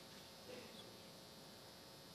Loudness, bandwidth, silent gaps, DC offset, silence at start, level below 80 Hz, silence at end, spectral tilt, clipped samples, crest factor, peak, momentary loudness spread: -57 LUFS; 14.5 kHz; none; under 0.1%; 0 s; -82 dBFS; 0 s; -3 dB/octave; under 0.1%; 16 dB; -42 dBFS; 3 LU